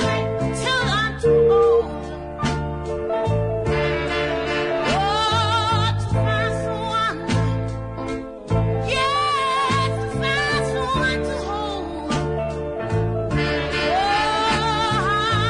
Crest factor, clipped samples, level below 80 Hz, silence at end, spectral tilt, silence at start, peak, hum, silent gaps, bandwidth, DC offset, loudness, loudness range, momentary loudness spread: 14 dB; under 0.1%; -36 dBFS; 0 s; -5.5 dB/octave; 0 s; -8 dBFS; none; none; 11 kHz; under 0.1%; -21 LUFS; 3 LU; 8 LU